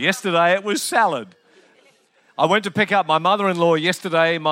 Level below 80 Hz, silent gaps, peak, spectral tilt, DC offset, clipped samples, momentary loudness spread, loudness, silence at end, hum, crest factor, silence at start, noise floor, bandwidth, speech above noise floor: -76 dBFS; none; -2 dBFS; -4 dB/octave; under 0.1%; under 0.1%; 4 LU; -18 LUFS; 0 s; none; 18 dB; 0 s; -57 dBFS; 16.5 kHz; 39 dB